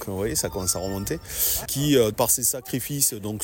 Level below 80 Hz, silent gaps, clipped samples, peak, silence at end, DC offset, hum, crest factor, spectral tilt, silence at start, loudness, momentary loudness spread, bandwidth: -44 dBFS; none; under 0.1%; -8 dBFS; 0 s; under 0.1%; none; 18 dB; -3.5 dB/octave; 0 s; -23 LUFS; 9 LU; 17 kHz